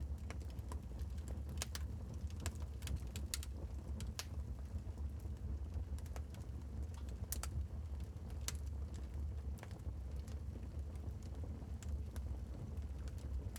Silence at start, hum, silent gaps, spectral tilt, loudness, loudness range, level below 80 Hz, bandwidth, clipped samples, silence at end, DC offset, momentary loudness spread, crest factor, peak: 0 s; none; none; -5 dB/octave; -47 LUFS; 2 LU; -46 dBFS; 19.5 kHz; under 0.1%; 0 s; under 0.1%; 4 LU; 24 dB; -22 dBFS